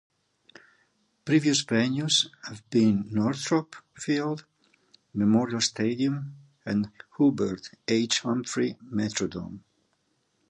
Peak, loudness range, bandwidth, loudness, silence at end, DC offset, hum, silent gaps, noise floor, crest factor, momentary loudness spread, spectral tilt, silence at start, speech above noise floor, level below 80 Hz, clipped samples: -10 dBFS; 3 LU; 11 kHz; -26 LUFS; 0.9 s; under 0.1%; none; none; -73 dBFS; 18 dB; 14 LU; -4.5 dB/octave; 1.25 s; 46 dB; -62 dBFS; under 0.1%